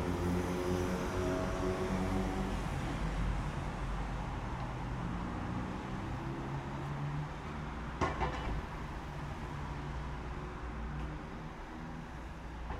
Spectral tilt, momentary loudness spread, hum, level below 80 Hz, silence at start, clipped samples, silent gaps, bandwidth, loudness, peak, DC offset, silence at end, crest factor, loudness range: -6.5 dB/octave; 9 LU; none; -44 dBFS; 0 s; under 0.1%; none; 15 kHz; -39 LUFS; -20 dBFS; under 0.1%; 0 s; 18 dB; 7 LU